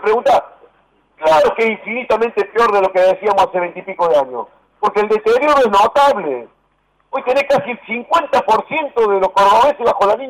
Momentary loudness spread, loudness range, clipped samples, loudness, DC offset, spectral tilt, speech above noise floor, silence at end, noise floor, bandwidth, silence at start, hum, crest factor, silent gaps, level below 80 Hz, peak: 11 LU; 2 LU; under 0.1%; -14 LUFS; under 0.1%; -4 dB/octave; 46 dB; 0 s; -60 dBFS; 15.5 kHz; 0 s; none; 8 dB; none; -52 dBFS; -6 dBFS